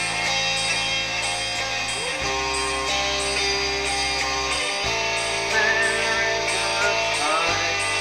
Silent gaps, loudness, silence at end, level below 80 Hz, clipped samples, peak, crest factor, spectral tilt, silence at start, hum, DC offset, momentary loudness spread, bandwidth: none; -21 LUFS; 0 s; -44 dBFS; under 0.1%; -8 dBFS; 16 dB; -1 dB/octave; 0 s; none; under 0.1%; 4 LU; 15.5 kHz